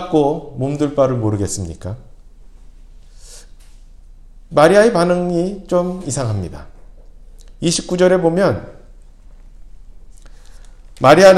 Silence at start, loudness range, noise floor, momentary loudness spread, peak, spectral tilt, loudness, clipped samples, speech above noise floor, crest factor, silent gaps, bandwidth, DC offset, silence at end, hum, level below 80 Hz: 0 s; 6 LU; -40 dBFS; 15 LU; 0 dBFS; -5.5 dB/octave; -16 LUFS; under 0.1%; 26 dB; 18 dB; none; 15.5 kHz; under 0.1%; 0 s; none; -40 dBFS